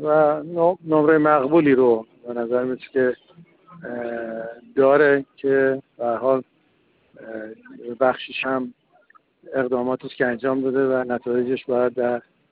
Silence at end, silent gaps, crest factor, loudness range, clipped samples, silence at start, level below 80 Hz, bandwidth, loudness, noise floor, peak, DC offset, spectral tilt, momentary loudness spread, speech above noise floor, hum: 0.3 s; none; 18 dB; 7 LU; under 0.1%; 0 s; -66 dBFS; 4.7 kHz; -21 LUFS; -62 dBFS; -4 dBFS; under 0.1%; -11 dB/octave; 17 LU; 42 dB; none